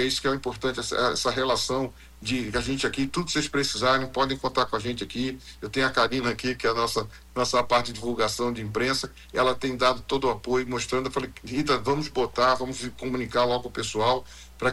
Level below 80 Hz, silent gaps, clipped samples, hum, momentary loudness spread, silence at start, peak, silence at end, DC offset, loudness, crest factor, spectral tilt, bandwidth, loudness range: -48 dBFS; none; under 0.1%; none; 8 LU; 0 s; -10 dBFS; 0 s; under 0.1%; -26 LUFS; 16 dB; -4 dB/octave; 16 kHz; 1 LU